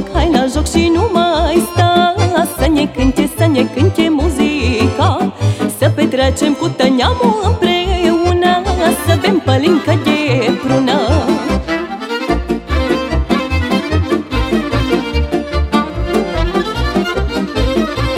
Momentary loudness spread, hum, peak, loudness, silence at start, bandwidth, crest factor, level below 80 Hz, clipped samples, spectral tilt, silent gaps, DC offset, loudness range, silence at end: 5 LU; none; 0 dBFS; -14 LUFS; 0 s; 16.5 kHz; 14 dB; -24 dBFS; under 0.1%; -6 dB/octave; none; under 0.1%; 3 LU; 0 s